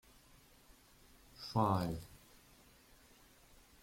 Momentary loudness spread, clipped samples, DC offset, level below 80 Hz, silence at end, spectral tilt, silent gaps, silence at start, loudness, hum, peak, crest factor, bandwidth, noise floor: 29 LU; under 0.1%; under 0.1%; -64 dBFS; 1.65 s; -7 dB/octave; none; 1.4 s; -38 LUFS; none; -20 dBFS; 22 dB; 16.5 kHz; -65 dBFS